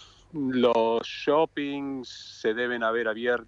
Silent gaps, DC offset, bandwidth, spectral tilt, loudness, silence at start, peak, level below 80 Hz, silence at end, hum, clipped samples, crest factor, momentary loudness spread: none; under 0.1%; 7.6 kHz; -5 dB/octave; -26 LUFS; 0 s; -12 dBFS; -64 dBFS; 0.05 s; none; under 0.1%; 16 dB; 12 LU